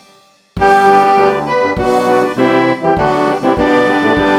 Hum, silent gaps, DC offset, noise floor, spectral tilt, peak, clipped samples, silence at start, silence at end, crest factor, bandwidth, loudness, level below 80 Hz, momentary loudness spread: none; none; under 0.1%; -46 dBFS; -6 dB/octave; 0 dBFS; under 0.1%; 0.55 s; 0 s; 10 dB; 15.5 kHz; -11 LUFS; -36 dBFS; 5 LU